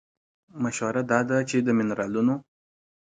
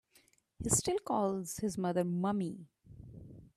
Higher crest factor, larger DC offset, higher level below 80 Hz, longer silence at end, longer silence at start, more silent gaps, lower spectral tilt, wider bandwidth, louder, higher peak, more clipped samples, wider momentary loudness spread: about the same, 20 dB vs 20 dB; neither; second, -66 dBFS vs -60 dBFS; first, 0.75 s vs 0.1 s; about the same, 0.55 s vs 0.6 s; neither; about the same, -6 dB/octave vs -5 dB/octave; second, 9.4 kHz vs 15.5 kHz; first, -25 LUFS vs -34 LUFS; first, -6 dBFS vs -16 dBFS; neither; second, 7 LU vs 22 LU